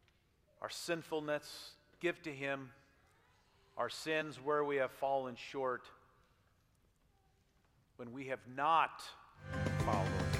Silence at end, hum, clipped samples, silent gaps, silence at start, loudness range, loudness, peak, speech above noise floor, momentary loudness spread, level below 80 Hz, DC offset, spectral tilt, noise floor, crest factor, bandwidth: 0 s; none; under 0.1%; none; 0.6 s; 5 LU; -39 LUFS; -18 dBFS; 35 dB; 17 LU; -62 dBFS; under 0.1%; -5.5 dB/octave; -73 dBFS; 22 dB; 16 kHz